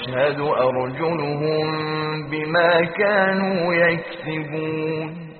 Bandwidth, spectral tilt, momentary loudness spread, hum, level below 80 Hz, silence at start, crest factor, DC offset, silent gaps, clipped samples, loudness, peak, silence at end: 4.6 kHz; -4 dB/octave; 9 LU; none; -58 dBFS; 0 s; 16 dB; under 0.1%; none; under 0.1%; -21 LUFS; -6 dBFS; 0 s